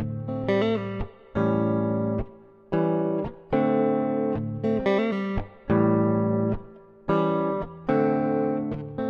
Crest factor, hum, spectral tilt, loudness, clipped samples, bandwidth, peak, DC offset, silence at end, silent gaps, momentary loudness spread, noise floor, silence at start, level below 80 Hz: 16 dB; none; -9.5 dB/octave; -25 LUFS; under 0.1%; 6.6 kHz; -10 dBFS; under 0.1%; 0 s; none; 9 LU; -45 dBFS; 0 s; -44 dBFS